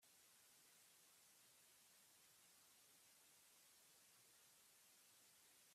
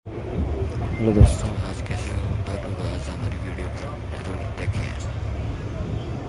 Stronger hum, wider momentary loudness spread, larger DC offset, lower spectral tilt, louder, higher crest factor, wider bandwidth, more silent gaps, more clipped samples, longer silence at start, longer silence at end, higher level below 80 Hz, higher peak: neither; second, 0 LU vs 13 LU; neither; second, 0 dB/octave vs -7 dB/octave; second, -70 LUFS vs -26 LUFS; second, 14 dB vs 22 dB; first, 15.5 kHz vs 11.5 kHz; neither; neither; about the same, 0 s vs 0.05 s; about the same, 0 s vs 0 s; second, under -90 dBFS vs -28 dBFS; second, -58 dBFS vs -2 dBFS